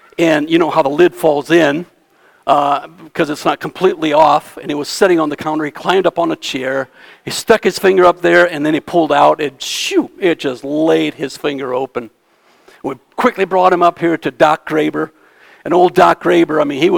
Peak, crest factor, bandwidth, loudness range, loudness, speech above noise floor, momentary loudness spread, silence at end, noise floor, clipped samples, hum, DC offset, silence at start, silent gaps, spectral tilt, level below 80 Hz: 0 dBFS; 14 dB; 18.5 kHz; 4 LU; -14 LUFS; 39 dB; 12 LU; 0 s; -53 dBFS; 0.2%; none; under 0.1%; 0.2 s; none; -4.5 dB/octave; -54 dBFS